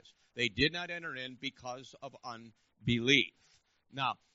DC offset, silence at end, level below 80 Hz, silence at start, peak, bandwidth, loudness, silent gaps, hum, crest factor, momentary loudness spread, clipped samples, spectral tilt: under 0.1%; 0.2 s; -60 dBFS; 0.35 s; -10 dBFS; 7.6 kHz; -33 LUFS; none; none; 26 dB; 20 LU; under 0.1%; -2 dB/octave